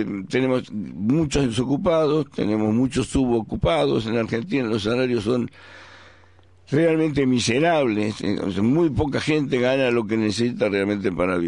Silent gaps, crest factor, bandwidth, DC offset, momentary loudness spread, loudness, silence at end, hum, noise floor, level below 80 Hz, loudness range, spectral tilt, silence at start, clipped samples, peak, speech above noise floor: none; 14 dB; 11 kHz; 0.2%; 5 LU; -22 LUFS; 0 s; none; -53 dBFS; -44 dBFS; 3 LU; -6 dB/octave; 0 s; under 0.1%; -8 dBFS; 32 dB